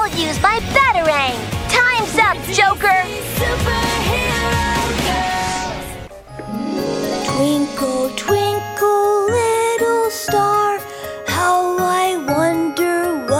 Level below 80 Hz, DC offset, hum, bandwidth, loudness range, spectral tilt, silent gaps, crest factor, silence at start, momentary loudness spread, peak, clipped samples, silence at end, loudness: -36 dBFS; under 0.1%; none; 16.5 kHz; 5 LU; -4 dB/octave; none; 16 dB; 0 s; 9 LU; 0 dBFS; under 0.1%; 0 s; -17 LUFS